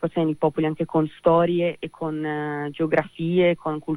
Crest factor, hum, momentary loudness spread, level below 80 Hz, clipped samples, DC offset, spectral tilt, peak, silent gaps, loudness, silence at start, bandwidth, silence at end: 16 dB; none; 8 LU; -56 dBFS; under 0.1%; under 0.1%; -8.5 dB/octave; -8 dBFS; none; -23 LUFS; 0 s; 10.5 kHz; 0 s